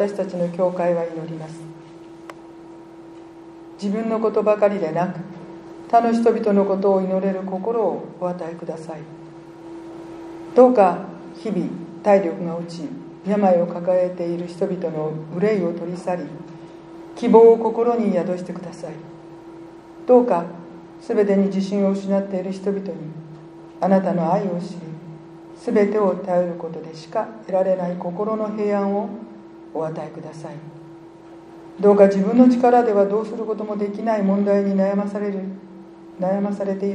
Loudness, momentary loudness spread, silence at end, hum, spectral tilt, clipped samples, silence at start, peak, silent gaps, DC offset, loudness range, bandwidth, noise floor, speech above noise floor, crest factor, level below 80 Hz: -20 LUFS; 24 LU; 0 s; none; -8.5 dB/octave; under 0.1%; 0 s; 0 dBFS; none; under 0.1%; 8 LU; 10 kHz; -42 dBFS; 22 dB; 20 dB; -66 dBFS